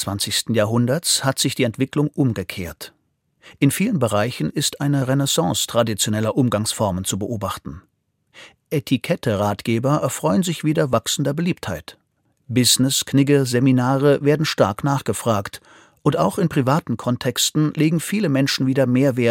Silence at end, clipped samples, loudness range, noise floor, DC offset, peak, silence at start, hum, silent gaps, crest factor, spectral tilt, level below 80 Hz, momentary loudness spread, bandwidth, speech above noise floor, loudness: 0 s; under 0.1%; 5 LU; -61 dBFS; under 0.1%; -2 dBFS; 0 s; none; none; 18 dB; -4.5 dB/octave; -56 dBFS; 9 LU; 17 kHz; 42 dB; -19 LUFS